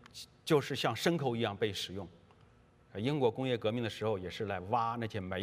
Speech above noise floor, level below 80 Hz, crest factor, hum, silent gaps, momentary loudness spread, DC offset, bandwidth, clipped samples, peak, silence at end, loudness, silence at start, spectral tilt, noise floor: 29 dB; -70 dBFS; 20 dB; none; none; 11 LU; under 0.1%; 15.5 kHz; under 0.1%; -14 dBFS; 0 s; -34 LUFS; 0.15 s; -5.5 dB/octave; -63 dBFS